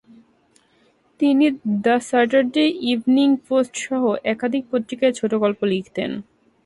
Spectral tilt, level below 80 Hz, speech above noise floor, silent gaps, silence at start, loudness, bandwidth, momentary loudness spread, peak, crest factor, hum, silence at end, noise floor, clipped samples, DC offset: -5 dB/octave; -64 dBFS; 40 dB; none; 1.2 s; -20 LUFS; 11.5 kHz; 7 LU; -4 dBFS; 16 dB; none; 0.45 s; -60 dBFS; under 0.1%; under 0.1%